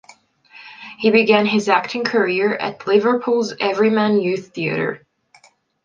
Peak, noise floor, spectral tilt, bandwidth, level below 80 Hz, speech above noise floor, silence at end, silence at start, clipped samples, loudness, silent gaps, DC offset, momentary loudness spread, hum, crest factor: 0 dBFS; -53 dBFS; -5.5 dB/octave; 7.6 kHz; -66 dBFS; 36 dB; 0.9 s; 0.55 s; under 0.1%; -18 LUFS; none; under 0.1%; 9 LU; none; 18 dB